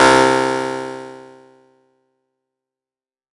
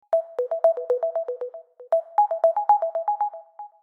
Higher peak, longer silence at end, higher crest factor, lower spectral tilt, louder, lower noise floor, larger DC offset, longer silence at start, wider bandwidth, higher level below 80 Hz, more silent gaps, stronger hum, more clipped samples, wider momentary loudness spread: first, 0 dBFS vs -8 dBFS; first, 2.15 s vs 0.15 s; about the same, 18 dB vs 16 dB; about the same, -3.5 dB/octave vs -3 dB/octave; first, -16 LUFS vs -24 LUFS; first, under -90 dBFS vs -42 dBFS; neither; about the same, 0 s vs 0.1 s; first, 11.5 kHz vs 3.8 kHz; first, -50 dBFS vs under -90 dBFS; neither; neither; neither; first, 21 LU vs 15 LU